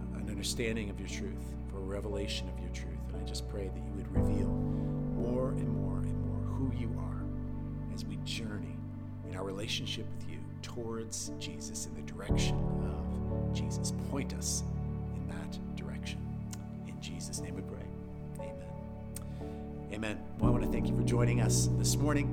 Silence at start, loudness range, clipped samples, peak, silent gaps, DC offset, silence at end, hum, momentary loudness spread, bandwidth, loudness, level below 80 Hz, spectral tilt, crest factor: 0 s; 7 LU; under 0.1%; -18 dBFS; none; under 0.1%; 0 s; none; 13 LU; 17 kHz; -36 LUFS; -42 dBFS; -5.5 dB/octave; 18 dB